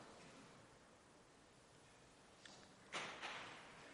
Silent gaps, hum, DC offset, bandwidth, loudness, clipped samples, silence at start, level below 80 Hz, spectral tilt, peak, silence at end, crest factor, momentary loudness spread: none; none; under 0.1%; 11.5 kHz; -54 LUFS; under 0.1%; 0 s; -82 dBFS; -2 dB/octave; -34 dBFS; 0 s; 24 dB; 18 LU